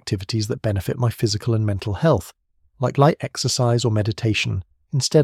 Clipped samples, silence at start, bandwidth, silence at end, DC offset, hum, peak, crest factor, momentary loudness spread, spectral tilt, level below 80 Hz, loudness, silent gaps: under 0.1%; 0.05 s; 15 kHz; 0 s; under 0.1%; none; -2 dBFS; 18 dB; 7 LU; -5.5 dB/octave; -48 dBFS; -21 LUFS; none